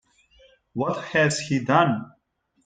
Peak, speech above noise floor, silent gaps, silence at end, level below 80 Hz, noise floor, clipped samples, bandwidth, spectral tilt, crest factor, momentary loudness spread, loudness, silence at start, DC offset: -4 dBFS; 48 dB; none; 0.55 s; -64 dBFS; -70 dBFS; under 0.1%; 9.6 kHz; -5 dB/octave; 20 dB; 10 LU; -23 LUFS; 0.75 s; under 0.1%